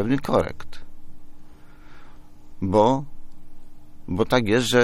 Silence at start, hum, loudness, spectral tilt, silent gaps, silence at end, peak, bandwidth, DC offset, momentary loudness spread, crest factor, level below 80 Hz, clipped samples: 0 s; none; -22 LUFS; -5.5 dB/octave; none; 0 s; -4 dBFS; 14 kHz; under 0.1%; 24 LU; 20 dB; -42 dBFS; under 0.1%